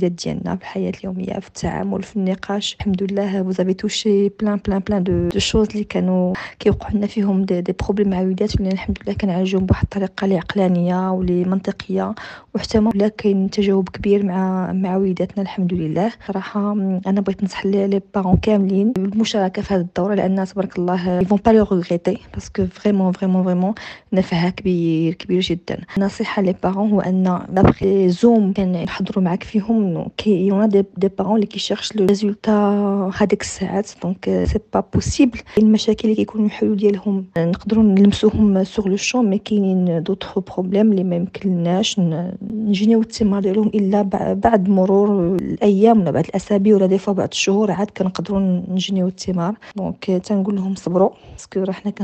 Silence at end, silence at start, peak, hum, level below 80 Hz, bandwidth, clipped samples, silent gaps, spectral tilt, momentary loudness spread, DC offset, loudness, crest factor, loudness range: 0 s; 0 s; 0 dBFS; none; -40 dBFS; 8.6 kHz; under 0.1%; none; -6.5 dB/octave; 8 LU; under 0.1%; -18 LUFS; 18 dB; 4 LU